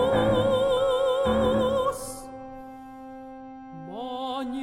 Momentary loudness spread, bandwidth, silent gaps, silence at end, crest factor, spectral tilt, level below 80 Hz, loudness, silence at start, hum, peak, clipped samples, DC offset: 20 LU; 15.5 kHz; none; 0 s; 16 dB; -5.5 dB/octave; -46 dBFS; -25 LUFS; 0 s; none; -10 dBFS; under 0.1%; under 0.1%